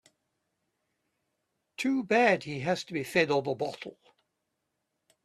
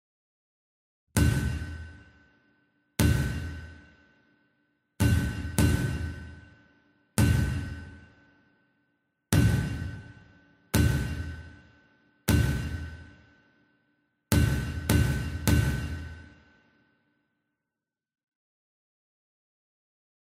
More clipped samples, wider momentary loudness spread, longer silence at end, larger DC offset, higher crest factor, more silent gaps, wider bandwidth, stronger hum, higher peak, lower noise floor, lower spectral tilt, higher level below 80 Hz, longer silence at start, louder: neither; about the same, 17 LU vs 19 LU; second, 1.35 s vs 4.15 s; neither; second, 22 dB vs 28 dB; neither; second, 14 kHz vs 16 kHz; neither; second, -10 dBFS vs -2 dBFS; second, -82 dBFS vs -89 dBFS; about the same, -5 dB/octave vs -5.5 dB/octave; second, -74 dBFS vs -38 dBFS; first, 1.8 s vs 1.15 s; about the same, -28 LUFS vs -28 LUFS